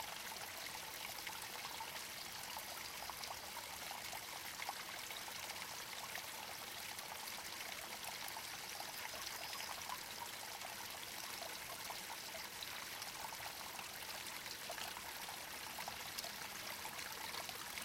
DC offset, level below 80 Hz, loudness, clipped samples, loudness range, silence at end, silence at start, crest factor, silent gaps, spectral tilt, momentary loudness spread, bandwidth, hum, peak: under 0.1%; -74 dBFS; -46 LUFS; under 0.1%; 1 LU; 0 s; 0 s; 22 dB; none; -0.5 dB/octave; 2 LU; 17 kHz; none; -28 dBFS